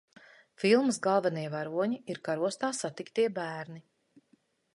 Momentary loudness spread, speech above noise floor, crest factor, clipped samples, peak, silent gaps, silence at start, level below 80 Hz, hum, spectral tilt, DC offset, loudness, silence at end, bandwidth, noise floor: 12 LU; 39 dB; 20 dB; under 0.1%; -12 dBFS; none; 0.6 s; -80 dBFS; none; -4.5 dB/octave; under 0.1%; -31 LUFS; 0.95 s; 11.5 kHz; -70 dBFS